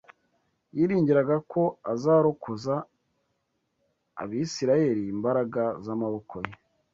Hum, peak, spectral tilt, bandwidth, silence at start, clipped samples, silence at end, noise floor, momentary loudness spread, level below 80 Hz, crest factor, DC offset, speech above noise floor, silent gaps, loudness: none; -10 dBFS; -7 dB/octave; 7.8 kHz; 0.75 s; under 0.1%; 0.4 s; -76 dBFS; 15 LU; -66 dBFS; 18 dB; under 0.1%; 51 dB; none; -26 LUFS